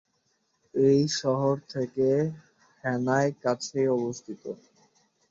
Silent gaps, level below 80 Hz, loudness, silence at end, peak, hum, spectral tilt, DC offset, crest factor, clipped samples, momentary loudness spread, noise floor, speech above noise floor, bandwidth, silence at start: none; -68 dBFS; -27 LUFS; 0.75 s; -10 dBFS; none; -5.5 dB/octave; under 0.1%; 16 dB; under 0.1%; 16 LU; -73 dBFS; 47 dB; 7.8 kHz; 0.75 s